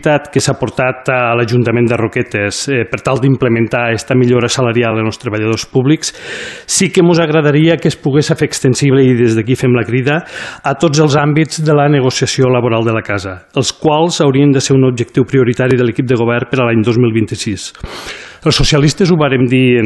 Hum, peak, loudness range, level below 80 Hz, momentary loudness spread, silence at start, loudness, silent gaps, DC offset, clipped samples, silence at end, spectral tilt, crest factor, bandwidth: none; 0 dBFS; 2 LU; -38 dBFS; 8 LU; 0 s; -12 LUFS; none; under 0.1%; under 0.1%; 0 s; -5.5 dB/octave; 12 dB; 12.5 kHz